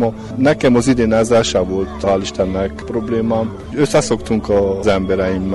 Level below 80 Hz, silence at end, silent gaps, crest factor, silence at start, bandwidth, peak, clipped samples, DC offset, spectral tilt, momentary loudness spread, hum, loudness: -34 dBFS; 0 s; none; 12 dB; 0 s; 11.5 kHz; -4 dBFS; under 0.1%; under 0.1%; -5.5 dB/octave; 7 LU; none; -16 LUFS